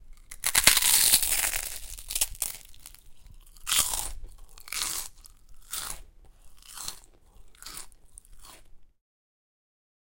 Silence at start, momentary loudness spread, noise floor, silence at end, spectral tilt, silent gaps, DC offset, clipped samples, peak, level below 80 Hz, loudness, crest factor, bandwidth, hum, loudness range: 0 s; 24 LU; -51 dBFS; 1.15 s; 1.5 dB/octave; none; under 0.1%; under 0.1%; 0 dBFS; -48 dBFS; -24 LUFS; 30 dB; 17 kHz; none; 21 LU